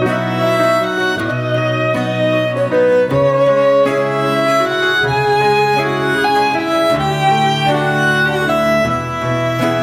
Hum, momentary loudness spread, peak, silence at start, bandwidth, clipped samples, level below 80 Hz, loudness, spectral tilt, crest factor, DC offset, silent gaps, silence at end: none; 4 LU; -2 dBFS; 0 s; 17 kHz; under 0.1%; -46 dBFS; -14 LUFS; -5.5 dB/octave; 12 dB; under 0.1%; none; 0 s